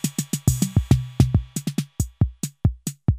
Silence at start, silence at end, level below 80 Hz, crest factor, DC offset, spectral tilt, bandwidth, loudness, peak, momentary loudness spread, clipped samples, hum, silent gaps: 0.05 s; 0 s; -32 dBFS; 22 dB; under 0.1%; -6 dB/octave; 16 kHz; -23 LUFS; -2 dBFS; 8 LU; under 0.1%; none; none